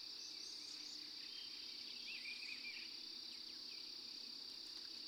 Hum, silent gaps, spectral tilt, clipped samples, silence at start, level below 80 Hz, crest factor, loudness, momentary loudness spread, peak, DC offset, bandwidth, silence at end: none; none; 1 dB/octave; under 0.1%; 0 s; -88 dBFS; 16 dB; -49 LUFS; 2 LU; -36 dBFS; under 0.1%; over 20 kHz; 0 s